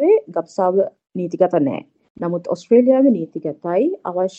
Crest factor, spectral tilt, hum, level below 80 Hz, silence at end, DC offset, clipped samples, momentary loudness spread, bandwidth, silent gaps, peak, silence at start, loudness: 16 dB; -8.5 dB/octave; none; -70 dBFS; 0.1 s; under 0.1%; under 0.1%; 13 LU; 8.2 kHz; 2.10-2.15 s; -2 dBFS; 0 s; -18 LUFS